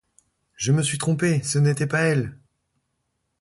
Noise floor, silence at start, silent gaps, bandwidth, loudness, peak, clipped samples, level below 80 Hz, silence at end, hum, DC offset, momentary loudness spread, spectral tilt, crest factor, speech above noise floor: -75 dBFS; 0.6 s; none; 11.5 kHz; -22 LUFS; -10 dBFS; under 0.1%; -60 dBFS; 1.05 s; none; under 0.1%; 5 LU; -5 dB/octave; 14 dB; 54 dB